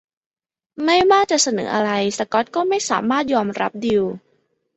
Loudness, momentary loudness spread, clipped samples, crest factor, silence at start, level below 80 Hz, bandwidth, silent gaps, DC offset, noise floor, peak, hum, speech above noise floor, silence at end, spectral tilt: -19 LUFS; 8 LU; under 0.1%; 18 dB; 0.8 s; -58 dBFS; 8.4 kHz; none; under 0.1%; -65 dBFS; -2 dBFS; none; 47 dB; 0.6 s; -3 dB/octave